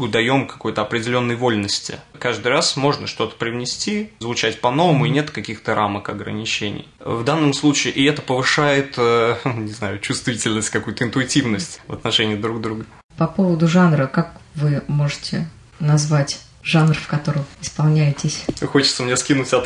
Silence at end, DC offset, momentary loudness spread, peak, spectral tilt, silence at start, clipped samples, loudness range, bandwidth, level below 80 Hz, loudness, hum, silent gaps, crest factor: 0 s; under 0.1%; 10 LU; -2 dBFS; -5 dB/octave; 0 s; under 0.1%; 3 LU; 11 kHz; -52 dBFS; -19 LUFS; none; 13.04-13.09 s; 16 dB